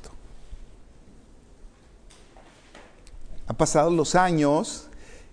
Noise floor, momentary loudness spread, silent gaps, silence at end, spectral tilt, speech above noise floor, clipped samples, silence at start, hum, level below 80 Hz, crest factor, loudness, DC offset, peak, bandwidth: -51 dBFS; 20 LU; none; 0.1 s; -5 dB/octave; 29 dB; under 0.1%; 0 s; none; -44 dBFS; 20 dB; -22 LUFS; under 0.1%; -6 dBFS; 10.5 kHz